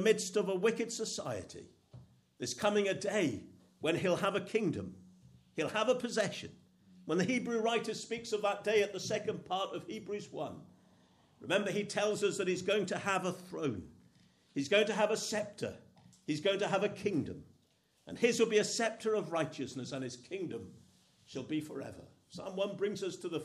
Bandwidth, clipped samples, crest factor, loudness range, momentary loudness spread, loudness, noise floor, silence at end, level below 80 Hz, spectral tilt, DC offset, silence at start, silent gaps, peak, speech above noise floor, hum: 14 kHz; under 0.1%; 20 dB; 4 LU; 15 LU; -35 LUFS; -72 dBFS; 0 s; -74 dBFS; -4 dB/octave; under 0.1%; 0 s; none; -16 dBFS; 38 dB; none